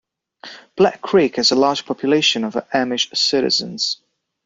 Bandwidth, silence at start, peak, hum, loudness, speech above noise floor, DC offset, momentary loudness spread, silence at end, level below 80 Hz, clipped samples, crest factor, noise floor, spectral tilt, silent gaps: 7.8 kHz; 0.45 s; -2 dBFS; none; -17 LUFS; 24 dB; under 0.1%; 9 LU; 0.5 s; -62 dBFS; under 0.1%; 18 dB; -41 dBFS; -3 dB/octave; none